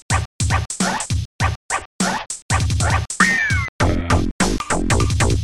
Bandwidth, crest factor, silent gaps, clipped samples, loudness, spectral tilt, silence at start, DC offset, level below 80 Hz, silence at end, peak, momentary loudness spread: 13.5 kHz; 18 dB; 0.25-0.39 s, 1.25-1.39 s, 1.56-1.69 s, 1.85-1.99 s, 2.42-2.49 s, 3.69-3.79 s, 4.31-4.39 s; under 0.1%; -19 LUFS; -4 dB/octave; 0.1 s; under 0.1%; -28 dBFS; 0 s; -2 dBFS; 7 LU